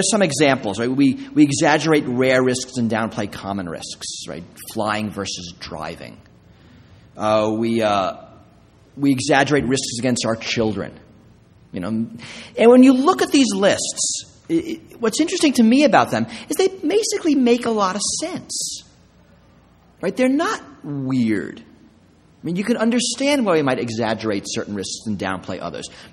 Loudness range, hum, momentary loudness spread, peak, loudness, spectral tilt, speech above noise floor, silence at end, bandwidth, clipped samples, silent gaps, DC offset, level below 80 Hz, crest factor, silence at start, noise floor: 8 LU; none; 15 LU; 0 dBFS; -19 LUFS; -4 dB/octave; 33 dB; 0.05 s; 14 kHz; under 0.1%; none; under 0.1%; -54 dBFS; 20 dB; 0 s; -52 dBFS